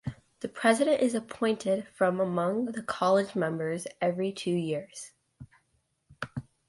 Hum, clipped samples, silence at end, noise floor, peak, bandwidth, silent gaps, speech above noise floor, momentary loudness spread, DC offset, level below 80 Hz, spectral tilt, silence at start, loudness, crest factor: none; under 0.1%; 0.3 s; -74 dBFS; -10 dBFS; 11.5 kHz; none; 46 dB; 15 LU; under 0.1%; -66 dBFS; -5.5 dB/octave; 0.05 s; -29 LUFS; 20 dB